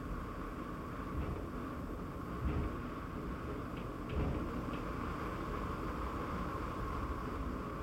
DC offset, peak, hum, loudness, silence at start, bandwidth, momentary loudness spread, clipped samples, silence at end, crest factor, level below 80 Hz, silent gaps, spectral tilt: under 0.1%; -24 dBFS; none; -41 LUFS; 0 s; 16 kHz; 5 LU; under 0.1%; 0 s; 16 dB; -46 dBFS; none; -7.5 dB/octave